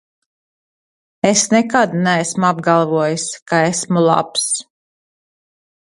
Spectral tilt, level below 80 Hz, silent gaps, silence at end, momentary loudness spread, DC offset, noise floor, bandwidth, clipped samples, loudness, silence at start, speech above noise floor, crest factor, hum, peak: -4 dB/octave; -62 dBFS; 3.42-3.46 s; 1.3 s; 6 LU; under 0.1%; under -90 dBFS; 11.5 kHz; under 0.1%; -16 LUFS; 1.25 s; over 75 dB; 18 dB; none; 0 dBFS